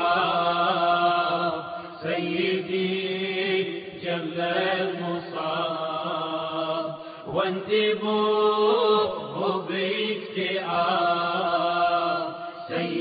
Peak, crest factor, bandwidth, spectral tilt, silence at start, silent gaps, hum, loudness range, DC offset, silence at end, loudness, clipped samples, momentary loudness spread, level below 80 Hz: -10 dBFS; 16 dB; 5 kHz; -2.5 dB/octave; 0 s; none; none; 4 LU; under 0.1%; 0 s; -25 LUFS; under 0.1%; 9 LU; -68 dBFS